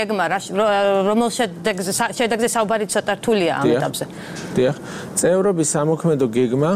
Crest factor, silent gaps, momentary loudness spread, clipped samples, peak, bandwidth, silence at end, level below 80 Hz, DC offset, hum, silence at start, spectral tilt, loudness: 14 dB; none; 7 LU; under 0.1%; -4 dBFS; 16 kHz; 0 s; -56 dBFS; under 0.1%; none; 0 s; -4.5 dB/octave; -19 LUFS